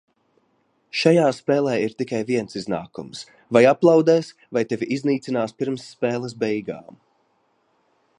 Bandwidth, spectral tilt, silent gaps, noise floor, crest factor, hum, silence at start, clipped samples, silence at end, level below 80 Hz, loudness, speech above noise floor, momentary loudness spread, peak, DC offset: 10.5 kHz; -6 dB/octave; none; -66 dBFS; 20 dB; none; 0.95 s; under 0.1%; 1.4 s; -66 dBFS; -21 LUFS; 45 dB; 13 LU; -2 dBFS; under 0.1%